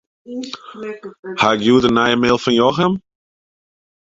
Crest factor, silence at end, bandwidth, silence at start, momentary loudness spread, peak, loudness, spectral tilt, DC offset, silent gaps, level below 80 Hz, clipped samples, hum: 16 dB; 1.05 s; 7.8 kHz; 0.3 s; 17 LU; -2 dBFS; -15 LUFS; -5.5 dB/octave; under 0.1%; 1.19-1.23 s; -50 dBFS; under 0.1%; none